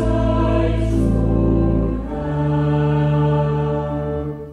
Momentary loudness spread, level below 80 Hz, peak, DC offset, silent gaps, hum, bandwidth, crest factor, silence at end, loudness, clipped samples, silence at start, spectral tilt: 6 LU; -26 dBFS; -6 dBFS; under 0.1%; none; none; 9.6 kHz; 12 dB; 0 s; -19 LUFS; under 0.1%; 0 s; -9.5 dB/octave